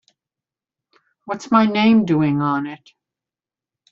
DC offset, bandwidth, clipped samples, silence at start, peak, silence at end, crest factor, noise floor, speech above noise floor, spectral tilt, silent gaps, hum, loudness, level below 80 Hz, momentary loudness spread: under 0.1%; 7.4 kHz; under 0.1%; 1.25 s; -2 dBFS; 1.15 s; 18 dB; -90 dBFS; 73 dB; -5.5 dB/octave; none; none; -17 LUFS; -60 dBFS; 16 LU